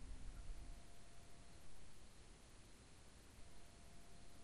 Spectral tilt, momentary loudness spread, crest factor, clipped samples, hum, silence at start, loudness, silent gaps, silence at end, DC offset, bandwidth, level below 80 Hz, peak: -4 dB/octave; 6 LU; 14 dB; under 0.1%; none; 0 s; -63 LUFS; none; 0 s; under 0.1%; 13 kHz; -60 dBFS; -40 dBFS